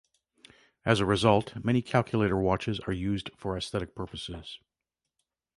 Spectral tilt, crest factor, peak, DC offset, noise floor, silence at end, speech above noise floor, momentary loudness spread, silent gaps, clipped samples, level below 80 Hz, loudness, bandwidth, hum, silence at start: -6 dB/octave; 24 dB; -6 dBFS; under 0.1%; -88 dBFS; 1 s; 60 dB; 15 LU; none; under 0.1%; -50 dBFS; -29 LUFS; 11.5 kHz; none; 0.85 s